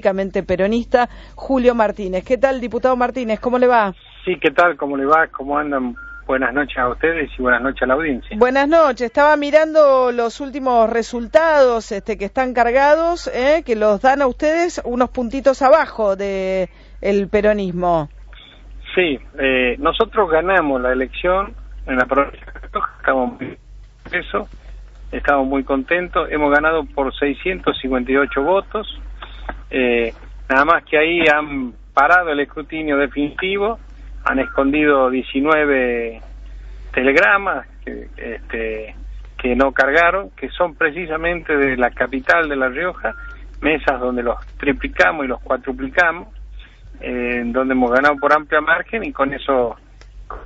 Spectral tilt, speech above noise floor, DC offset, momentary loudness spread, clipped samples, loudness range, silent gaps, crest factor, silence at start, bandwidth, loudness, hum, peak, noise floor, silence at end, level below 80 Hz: -3 dB/octave; 22 dB; under 0.1%; 13 LU; under 0.1%; 4 LU; none; 16 dB; 0.05 s; 8 kHz; -17 LUFS; none; 0 dBFS; -39 dBFS; 0 s; -38 dBFS